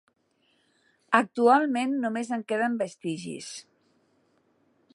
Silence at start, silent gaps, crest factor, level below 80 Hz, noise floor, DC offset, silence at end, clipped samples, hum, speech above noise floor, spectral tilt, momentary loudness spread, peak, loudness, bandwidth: 1.1 s; none; 24 dB; -82 dBFS; -69 dBFS; under 0.1%; 1.35 s; under 0.1%; none; 43 dB; -4.5 dB/octave; 16 LU; -4 dBFS; -26 LUFS; 11.5 kHz